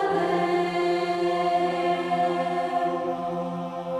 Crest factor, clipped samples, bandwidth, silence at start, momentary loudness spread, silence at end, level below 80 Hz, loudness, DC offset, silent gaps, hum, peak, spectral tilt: 12 dB; under 0.1%; 11.5 kHz; 0 s; 6 LU; 0 s; -66 dBFS; -25 LUFS; under 0.1%; none; none; -12 dBFS; -6 dB/octave